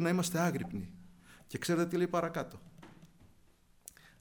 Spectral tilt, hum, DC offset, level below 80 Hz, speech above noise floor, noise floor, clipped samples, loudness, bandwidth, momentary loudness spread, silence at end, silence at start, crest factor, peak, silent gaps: -5.5 dB/octave; none; under 0.1%; -64 dBFS; 31 dB; -65 dBFS; under 0.1%; -34 LUFS; over 20 kHz; 23 LU; 0.95 s; 0 s; 18 dB; -18 dBFS; none